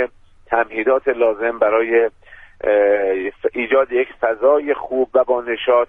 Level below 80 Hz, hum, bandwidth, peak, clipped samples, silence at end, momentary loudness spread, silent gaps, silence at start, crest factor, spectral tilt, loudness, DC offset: -52 dBFS; none; 3.7 kHz; -2 dBFS; under 0.1%; 0.05 s; 6 LU; none; 0 s; 14 dB; -6.5 dB/octave; -18 LUFS; under 0.1%